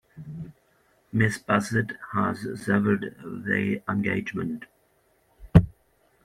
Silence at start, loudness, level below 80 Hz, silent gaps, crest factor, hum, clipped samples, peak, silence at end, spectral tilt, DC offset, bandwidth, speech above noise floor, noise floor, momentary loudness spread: 0.15 s; -26 LUFS; -44 dBFS; none; 26 dB; none; under 0.1%; 0 dBFS; 0.55 s; -7 dB/octave; under 0.1%; 13.5 kHz; 39 dB; -66 dBFS; 18 LU